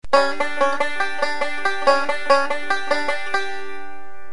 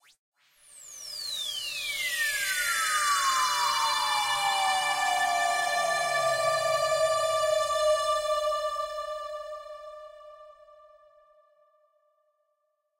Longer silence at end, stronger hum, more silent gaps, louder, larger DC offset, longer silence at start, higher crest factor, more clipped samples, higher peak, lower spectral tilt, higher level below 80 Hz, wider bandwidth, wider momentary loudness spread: second, 0 s vs 2.5 s; neither; neither; first, -21 LUFS vs -27 LUFS; first, 7% vs under 0.1%; second, 0 s vs 0.7 s; first, 20 dB vs 14 dB; neither; first, 0 dBFS vs -14 dBFS; first, -2.5 dB/octave vs 1 dB/octave; first, -54 dBFS vs -64 dBFS; second, 11 kHz vs 16 kHz; about the same, 14 LU vs 15 LU